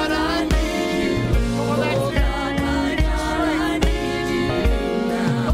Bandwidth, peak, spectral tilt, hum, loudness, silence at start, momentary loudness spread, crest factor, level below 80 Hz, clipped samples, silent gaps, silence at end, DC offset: 15.5 kHz; -4 dBFS; -6 dB/octave; none; -21 LUFS; 0 s; 2 LU; 16 dB; -26 dBFS; under 0.1%; none; 0 s; under 0.1%